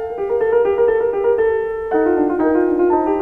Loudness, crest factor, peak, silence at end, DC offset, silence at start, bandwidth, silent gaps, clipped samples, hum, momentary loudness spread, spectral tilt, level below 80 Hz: -17 LUFS; 12 dB; -4 dBFS; 0 s; 0.2%; 0 s; 3.3 kHz; none; under 0.1%; none; 4 LU; -8.5 dB/octave; -46 dBFS